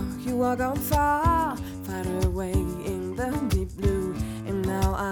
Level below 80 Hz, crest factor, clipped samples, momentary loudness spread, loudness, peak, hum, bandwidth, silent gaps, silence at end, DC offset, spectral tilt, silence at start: -34 dBFS; 16 dB; under 0.1%; 8 LU; -27 LUFS; -10 dBFS; none; 19 kHz; none; 0 s; under 0.1%; -6.5 dB/octave; 0 s